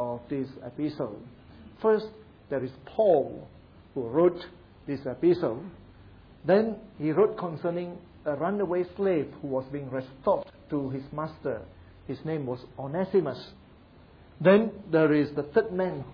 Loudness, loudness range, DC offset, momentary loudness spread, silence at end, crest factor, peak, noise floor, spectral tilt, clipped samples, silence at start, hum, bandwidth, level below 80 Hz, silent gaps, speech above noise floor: -28 LUFS; 6 LU; under 0.1%; 14 LU; 0 s; 20 dB; -10 dBFS; -54 dBFS; -10 dB/octave; under 0.1%; 0 s; none; 5.4 kHz; -60 dBFS; none; 26 dB